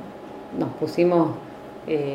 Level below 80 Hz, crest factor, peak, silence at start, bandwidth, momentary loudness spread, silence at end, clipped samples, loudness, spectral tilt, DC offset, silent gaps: -60 dBFS; 18 dB; -8 dBFS; 0 s; 12 kHz; 19 LU; 0 s; under 0.1%; -24 LUFS; -8 dB/octave; under 0.1%; none